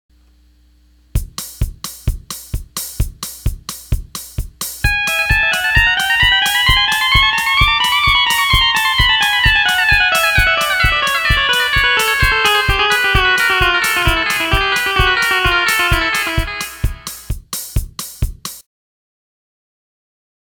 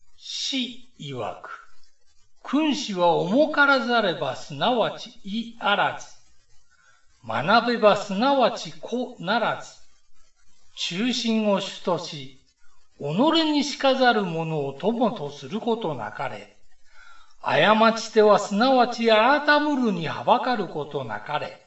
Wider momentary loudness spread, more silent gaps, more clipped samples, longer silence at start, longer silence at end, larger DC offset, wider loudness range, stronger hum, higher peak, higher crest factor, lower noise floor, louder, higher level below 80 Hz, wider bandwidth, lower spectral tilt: about the same, 14 LU vs 15 LU; neither; neither; first, 1.15 s vs 0.1 s; first, 2 s vs 0.1 s; second, under 0.1% vs 0.4%; first, 14 LU vs 8 LU; neither; first, 0 dBFS vs -4 dBFS; about the same, 16 dB vs 20 dB; second, -50 dBFS vs -58 dBFS; first, -13 LUFS vs -23 LUFS; first, -24 dBFS vs -64 dBFS; first, 19.5 kHz vs 8.2 kHz; second, -2 dB/octave vs -4.5 dB/octave